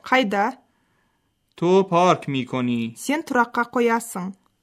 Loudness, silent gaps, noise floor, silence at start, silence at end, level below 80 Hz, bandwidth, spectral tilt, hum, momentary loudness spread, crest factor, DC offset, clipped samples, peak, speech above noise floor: -21 LUFS; none; -69 dBFS; 0.05 s; 0.3 s; -68 dBFS; 15.5 kHz; -5 dB/octave; none; 8 LU; 18 dB; under 0.1%; under 0.1%; -4 dBFS; 48 dB